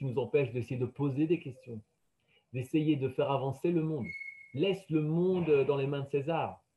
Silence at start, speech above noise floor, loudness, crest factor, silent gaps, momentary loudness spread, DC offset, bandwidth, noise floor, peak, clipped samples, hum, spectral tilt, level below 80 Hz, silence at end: 0 s; 41 dB; -32 LUFS; 16 dB; none; 14 LU; under 0.1%; 12 kHz; -72 dBFS; -16 dBFS; under 0.1%; none; -8.5 dB/octave; -70 dBFS; 0.2 s